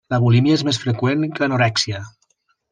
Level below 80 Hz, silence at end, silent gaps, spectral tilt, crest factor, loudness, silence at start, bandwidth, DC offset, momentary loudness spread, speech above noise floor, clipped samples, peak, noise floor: -56 dBFS; 0.6 s; none; -5.5 dB/octave; 14 dB; -18 LUFS; 0.1 s; 9.6 kHz; under 0.1%; 6 LU; 48 dB; under 0.1%; -4 dBFS; -65 dBFS